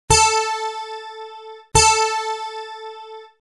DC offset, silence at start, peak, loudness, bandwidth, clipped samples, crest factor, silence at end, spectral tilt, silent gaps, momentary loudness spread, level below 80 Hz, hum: under 0.1%; 0.1 s; 0 dBFS; -17 LUFS; 12.5 kHz; under 0.1%; 20 dB; 0.25 s; -1.5 dB/octave; none; 22 LU; -38 dBFS; none